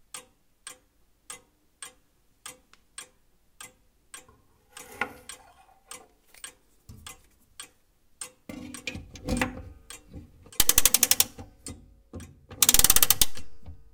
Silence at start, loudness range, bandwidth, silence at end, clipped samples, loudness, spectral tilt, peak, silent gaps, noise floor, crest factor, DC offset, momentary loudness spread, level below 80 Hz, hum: 0.15 s; 25 LU; 18 kHz; 0.2 s; under 0.1%; -22 LUFS; -0.5 dB/octave; -2 dBFS; none; -64 dBFS; 28 dB; under 0.1%; 29 LU; -46 dBFS; none